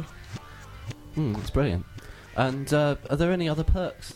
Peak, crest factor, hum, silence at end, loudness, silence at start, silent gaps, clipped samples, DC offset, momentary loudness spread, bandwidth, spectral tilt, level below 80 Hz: -8 dBFS; 18 dB; none; 0 s; -27 LUFS; 0 s; none; under 0.1%; under 0.1%; 17 LU; 15.5 kHz; -6.5 dB/octave; -36 dBFS